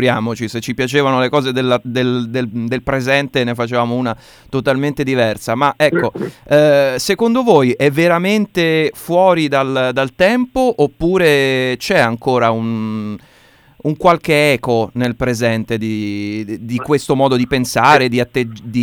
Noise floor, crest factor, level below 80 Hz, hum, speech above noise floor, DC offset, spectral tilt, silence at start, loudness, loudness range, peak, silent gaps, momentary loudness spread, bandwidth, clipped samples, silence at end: -48 dBFS; 14 dB; -44 dBFS; none; 33 dB; under 0.1%; -5.5 dB/octave; 0 s; -15 LUFS; 4 LU; 0 dBFS; none; 9 LU; 19 kHz; under 0.1%; 0 s